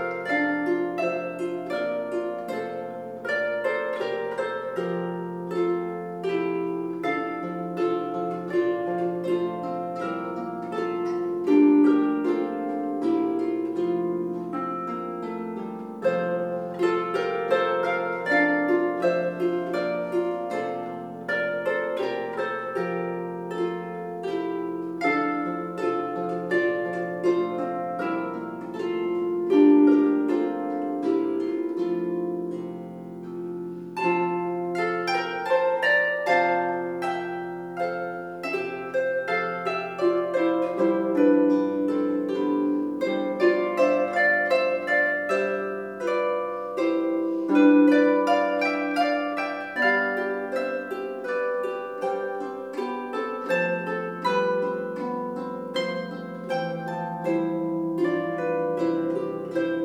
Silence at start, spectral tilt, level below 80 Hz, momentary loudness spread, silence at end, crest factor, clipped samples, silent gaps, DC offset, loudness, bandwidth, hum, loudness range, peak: 0 s; -6.5 dB/octave; -76 dBFS; 10 LU; 0 s; 18 dB; under 0.1%; none; under 0.1%; -26 LUFS; 11 kHz; none; 6 LU; -6 dBFS